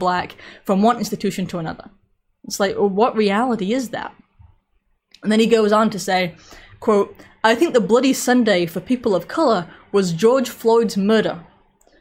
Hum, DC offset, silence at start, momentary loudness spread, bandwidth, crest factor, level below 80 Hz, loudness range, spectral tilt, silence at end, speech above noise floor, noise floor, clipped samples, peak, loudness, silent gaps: none; under 0.1%; 0 s; 12 LU; 16.5 kHz; 18 dB; -56 dBFS; 4 LU; -5 dB/octave; 0.6 s; 47 dB; -65 dBFS; under 0.1%; -2 dBFS; -18 LUFS; none